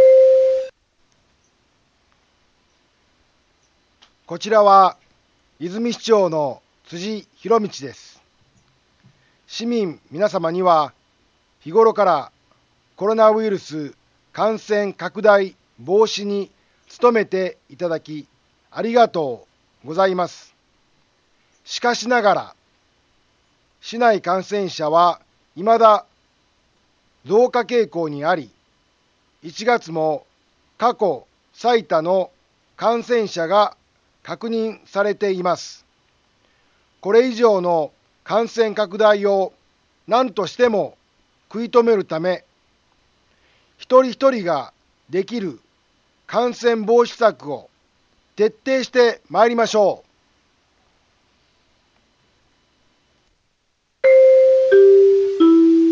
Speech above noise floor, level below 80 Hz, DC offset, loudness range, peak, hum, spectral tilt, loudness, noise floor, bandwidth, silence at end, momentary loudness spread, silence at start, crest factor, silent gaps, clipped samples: 49 dB; -70 dBFS; under 0.1%; 5 LU; 0 dBFS; none; -5 dB/octave; -18 LUFS; -67 dBFS; 7.4 kHz; 0 s; 18 LU; 0 s; 18 dB; none; under 0.1%